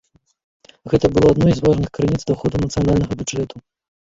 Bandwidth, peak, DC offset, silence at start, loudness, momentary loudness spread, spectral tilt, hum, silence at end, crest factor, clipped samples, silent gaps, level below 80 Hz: 7.8 kHz; -2 dBFS; under 0.1%; 0.85 s; -18 LUFS; 10 LU; -7 dB/octave; none; 0.45 s; 16 dB; under 0.1%; none; -36 dBFS